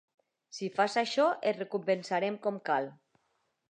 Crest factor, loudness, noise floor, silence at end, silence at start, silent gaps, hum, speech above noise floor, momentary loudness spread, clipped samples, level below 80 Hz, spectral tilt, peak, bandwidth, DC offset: 18 dB; -31 LUFS; -77 dBFS; 0.75 s; 0.55 s; none; none; 47 dB; 10 LU; under 0.1%; -88 dBFS; -4.5 dB/octave; -16 dBFS; 10 kHz; under 0.1%